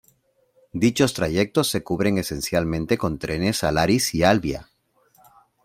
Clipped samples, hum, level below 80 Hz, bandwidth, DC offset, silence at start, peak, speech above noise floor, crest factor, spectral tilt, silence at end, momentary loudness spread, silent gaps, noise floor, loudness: under 0.1%; none; -46 dBFS; 16.5 kHz; under 0.1%; 0.75 s; -2 dBFS; 42 dB; 20 dB; -5 dB/octave; 1 s; 6 LU; none; -63 dBFS; -22 LUFS